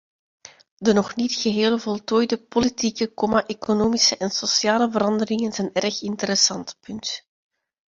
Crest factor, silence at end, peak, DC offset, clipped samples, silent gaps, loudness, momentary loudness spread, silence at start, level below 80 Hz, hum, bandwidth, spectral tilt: 20 dB; 0.75 s; -4 dBFS; under 0.1%; under 0.1%; none; -21 LUFS; 9 LU; 0.8 s; -56 dBFS; none; 7.6 kHz; -3 dB/octave